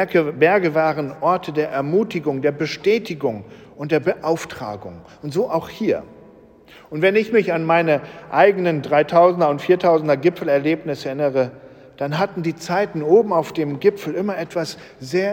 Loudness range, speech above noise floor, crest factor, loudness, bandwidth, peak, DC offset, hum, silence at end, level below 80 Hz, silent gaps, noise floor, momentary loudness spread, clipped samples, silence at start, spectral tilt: 6 LU; 27 dB; 18 dB; -19 LUFS; 17 kHz; -2 dBFS; under 0.1%; none; 0 s; -60 dBFS; none; -46 dBFS; 11 LU; under 0.1%; 0 s; -6.5 dB/octave